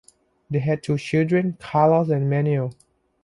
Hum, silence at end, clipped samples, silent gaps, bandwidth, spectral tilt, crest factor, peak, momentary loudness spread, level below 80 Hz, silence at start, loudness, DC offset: none; 0.5 s; under 0.1%; none; 11.5 kHz; -8.5 dB/octave; 16 dB; -6 dBFS; 8 LU; -58 dBFS; 0.5 s; -22 LUFS; under 0.1%